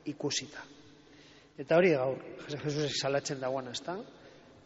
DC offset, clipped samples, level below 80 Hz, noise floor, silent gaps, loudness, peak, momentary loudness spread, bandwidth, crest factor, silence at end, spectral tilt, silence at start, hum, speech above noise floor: under 0.1%; under 0.1%; -72 dBFS; -57 dBFS; none; -32 LUFS; -14 dBFS; 21 LU; 8 kHz; 20 dB; 0.35 s; -4 dB/octave; 0.05 s; none; 25 dB